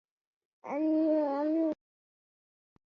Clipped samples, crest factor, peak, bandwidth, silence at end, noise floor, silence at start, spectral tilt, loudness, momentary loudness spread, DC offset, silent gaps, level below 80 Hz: under 0.1%; 14 dB; -20 dBFS; 5.6 kHz; 1.15 s; under -90 dBFS; 0.65 s; -7.5 dB/octave; -30 LUFS; 14 LU; under 0.1%; none; -86 dBFS